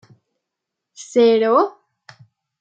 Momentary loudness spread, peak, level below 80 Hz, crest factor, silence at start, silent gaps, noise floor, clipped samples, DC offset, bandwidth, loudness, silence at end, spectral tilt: 12 LU; -4 dBFS; -76 dBFS; 16 dB; 1 s; none; -82 dBFS; under 0.1%; under 0.1%; 8.6 kHz; -16 LUFS; 0.9 s; -4.5 dB/octave